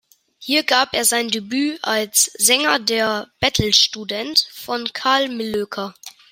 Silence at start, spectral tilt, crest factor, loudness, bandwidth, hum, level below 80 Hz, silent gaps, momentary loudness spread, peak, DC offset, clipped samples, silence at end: 0.4 s; -1.5 dB/octave; 20 dB; -18 LUFS; 16.5 kHz; none; -50 dBFS; none; 11 LU; 0 dBFS; under 0.1%; under 0.1%; 0.2 s